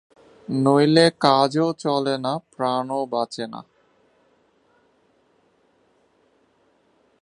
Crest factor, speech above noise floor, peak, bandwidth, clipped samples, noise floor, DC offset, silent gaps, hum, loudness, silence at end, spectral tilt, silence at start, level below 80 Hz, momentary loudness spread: 24 dB; 43 dB; 0 dBFS; 11 kHz; under 0.1%; -63 dBFS; under 0.1%; none; none; -21 LUFS; 3.6 s; -6 dB/octave; 0.5 s; -70 dBFS; 15 LU